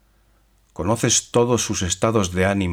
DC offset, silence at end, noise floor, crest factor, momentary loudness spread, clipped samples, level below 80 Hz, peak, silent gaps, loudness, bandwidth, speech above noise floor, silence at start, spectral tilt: under 0.1%; 0 s; -58 dBFS; 16 dB; 5 LU; under 0.1%; -46 dBFS; -6 dBFS; none; -20 LUFS; 17 kHz; 39 dB; 0.8 s; -4 dB/octave